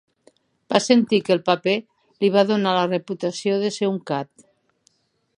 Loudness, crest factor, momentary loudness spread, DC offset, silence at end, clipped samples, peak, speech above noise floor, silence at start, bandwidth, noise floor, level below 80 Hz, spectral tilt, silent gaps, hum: -21 LUFS; 22 dB; 9 LU; under 0.1%; 1.15 s; under 0.1%; 0 dBFS; 44 dB; 0.7 s; 11 kHz; -65 dBFS; -72 dBFS; -5 dB/octave; none; none